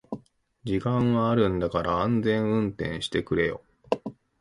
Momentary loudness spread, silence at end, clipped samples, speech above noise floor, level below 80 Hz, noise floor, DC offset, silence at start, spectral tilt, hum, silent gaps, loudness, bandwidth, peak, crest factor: 17 LU; 0.3 s; under 0.1%; 28 dB; -48 dBFS; -53 dBFS; under 0.1%; 0.1 s; -7.5 dB/octave; none; none; -26 LUFS; 11.5 kHz; -6 dBFS; 20 dB